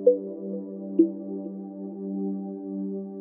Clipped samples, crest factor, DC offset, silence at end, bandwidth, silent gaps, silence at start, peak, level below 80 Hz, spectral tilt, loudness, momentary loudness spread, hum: under 0.1%; 20 dB; under 0.1%; 0 s; 1.2 kHz; none; 0 s; -6 dBFS; -84 dBFS; -13.5 dB/octave; -30 LUFS; 12 LU; none